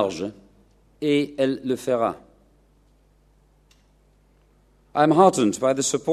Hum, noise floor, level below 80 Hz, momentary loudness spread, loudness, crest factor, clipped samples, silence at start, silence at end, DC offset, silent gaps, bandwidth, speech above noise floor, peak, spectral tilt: none; -59 dBFS; -60 dBFS; 14 LU; -22 LUFS; 22 dB; under 0.1%; 0 s; 0 s; under 0.1%; none; 14 kHz; 38 dB; -2 dBFS; -4.5 dB/octave